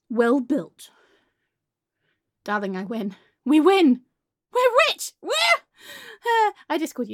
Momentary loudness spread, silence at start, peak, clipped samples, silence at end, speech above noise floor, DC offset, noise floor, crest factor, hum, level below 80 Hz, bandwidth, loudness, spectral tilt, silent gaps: 17 LU; 0.1 s; -4 dBFS; under 0.1%; 0 s; 62 dB; under 0.1%; -83 dBFS; 18 dB; none; -78 dBFS; 17 kHz; -21 LUFS; -3.5 dB/octave; none